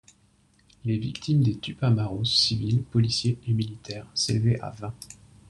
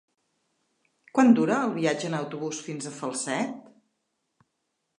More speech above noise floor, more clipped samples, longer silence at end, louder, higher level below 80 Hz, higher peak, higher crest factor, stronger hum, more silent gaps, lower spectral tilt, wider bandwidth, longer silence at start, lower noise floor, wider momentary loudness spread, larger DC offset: second, 37 dB vs 54 dB; neither; second, 0.35 s vs 1.4 s; about the same, -25 LUFS vs -26 LUFS; first, -54 dBFS vs -78 dBFS; about the same, -8 dBFS vs -6 dBFS; about the same, 18 dB vs 22 dB; neither; neither; about the same, -5.5 dB/octave vs -5 dB/octave; about the same, 11.5 kHz vs 11 kHz; second, 0.85 s vs 1.15 s; second, -62 dBFS vs -79 dBFS; about the same, 15 LU vs 14 LU; neither